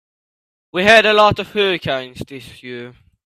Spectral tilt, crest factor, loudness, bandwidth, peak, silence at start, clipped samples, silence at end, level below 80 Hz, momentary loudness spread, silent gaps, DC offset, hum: -4 dB/octave; 18 dB; -14 LUFS; 14 kHz; 0 dBFS; 0.75 s; under 0.1%; 0.35 s; -48 dBFS; 23 LU; none; under 0.1%; none